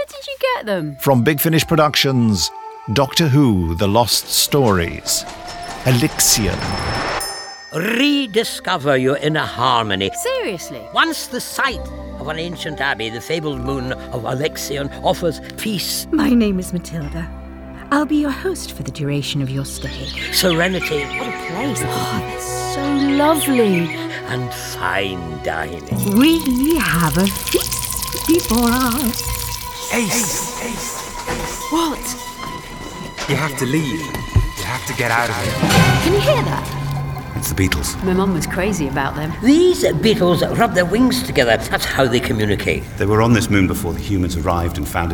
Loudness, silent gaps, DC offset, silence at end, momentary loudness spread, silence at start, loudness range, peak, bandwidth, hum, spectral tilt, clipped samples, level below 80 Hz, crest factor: -18 LUFS; none; under 0.1%; 0 s; 11 LU; 0 s; 6 LU; 0 dBFS; over 20 kHz; none; -4.5 dB/octave; under 0.1%; -34 dBFS; 18 dB